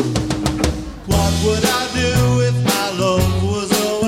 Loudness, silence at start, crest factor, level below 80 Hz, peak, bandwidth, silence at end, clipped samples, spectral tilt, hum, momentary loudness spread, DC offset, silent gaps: -17 LUFS; 0 s; 16 dB; -28 dBFS; -2 dBFS; 16.5 kHz; 0 s; under 0.1%; -5 dB/octave; none; 5 LU; under 0.1%; none